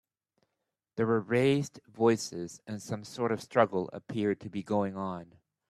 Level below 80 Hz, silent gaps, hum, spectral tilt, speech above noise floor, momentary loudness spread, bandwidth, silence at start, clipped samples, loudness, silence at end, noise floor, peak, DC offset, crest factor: -72 dBFS; none; none; -6 dB/octave; 55 dB; 14 LU; 13.5 kHz; 0.95 s; under 0.1%; -31 LUFS; 0.45 s; -85 dBFS; -10 dBFS; under 0.1%; 22 dB